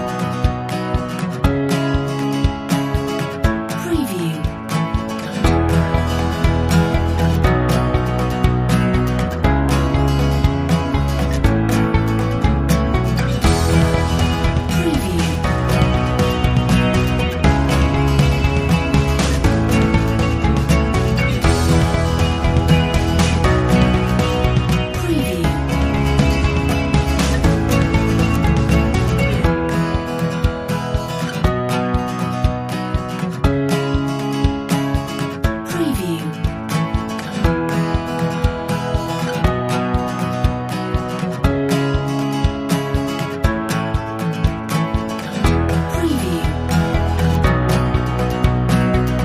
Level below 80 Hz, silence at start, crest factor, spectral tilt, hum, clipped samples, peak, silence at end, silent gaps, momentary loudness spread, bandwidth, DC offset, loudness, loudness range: -24 dBFS; 0 s; 16 dB; -6.5 dB/octave; none; under 0.1%; -2 dBFS; 0 s; none; 6 LU; 15.5 kHz; under 0.1%; -18 LUFS; 4 LU